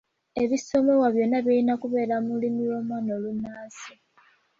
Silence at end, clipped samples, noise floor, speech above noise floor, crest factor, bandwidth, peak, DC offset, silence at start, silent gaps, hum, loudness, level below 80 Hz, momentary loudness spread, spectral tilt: 0.7 s; under 0.1%; -61 dBFS; 37 dB; 16 dB; 7.6 kHz; -10 dBFS; under 0.1%; 0.35 s; none; none; -25 LUFS; -64 dBFS; 16 LU; -6 dB/octave